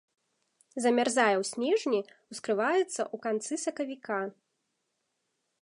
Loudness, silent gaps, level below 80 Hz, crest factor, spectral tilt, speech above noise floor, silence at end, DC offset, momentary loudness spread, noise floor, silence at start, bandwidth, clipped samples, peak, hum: -30 LUFS; none; -86 dBFS; 20 dB; -3 dB/octave; 51 dB; 1.3 s; under 0.1%; 12 LU; -80 dBFS; 0.75 s; 11.5 kHz; under 0.1%; -10 dBFS; none